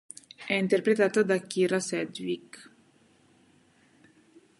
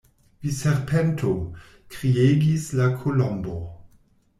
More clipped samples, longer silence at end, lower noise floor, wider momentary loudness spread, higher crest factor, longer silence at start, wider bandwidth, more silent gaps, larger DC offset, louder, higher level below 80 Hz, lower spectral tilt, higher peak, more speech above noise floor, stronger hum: neither; first, 2 s vs 0.55 s; first, -62 dBFS vs -58 dBFS; first, 21 LU vs 16 LU; about the same, 20 dB vs 16 dB; about the same, 0.4 s vs 0.4 s; second, 11.5 kHz vs 14 kHz; neither; neither; second, -27 LUFS vs -23 LUFS; second, -76 dBFS vs -48 dBFS; second, -5 dB/octave vs -7 dB/octave; about the same, -10 dBFS vs -8 dBFS; about the same, 36 dB vs 36 dB; neither